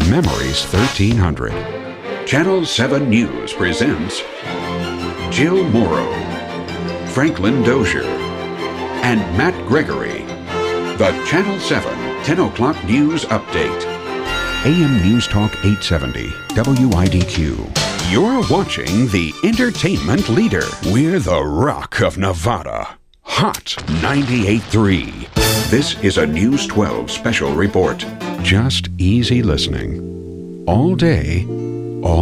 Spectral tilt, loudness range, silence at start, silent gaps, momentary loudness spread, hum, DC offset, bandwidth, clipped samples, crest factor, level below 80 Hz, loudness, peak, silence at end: -5.5 dB/octave; 2 LU; 0 s; none; 9 LU; none; under 0.1%; 15.5 kHz; under 0.1%; 16 dB; -32 dBFS; -17 LUFS; 0 dBFS; 0 s